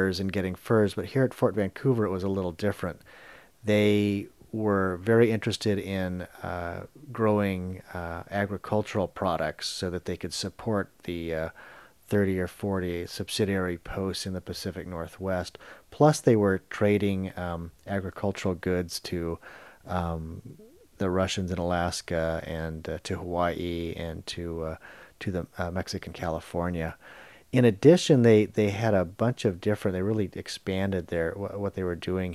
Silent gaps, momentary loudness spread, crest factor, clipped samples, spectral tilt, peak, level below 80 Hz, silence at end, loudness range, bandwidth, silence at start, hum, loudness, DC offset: none; 14 LU; 22 dB; under 0.1%; -6 dB/octave; -6 dBFS; -52 dBFS; 0 s; 9 LU; 14.5 kHz; 0 s; none; -28 LUFS; under 0.1%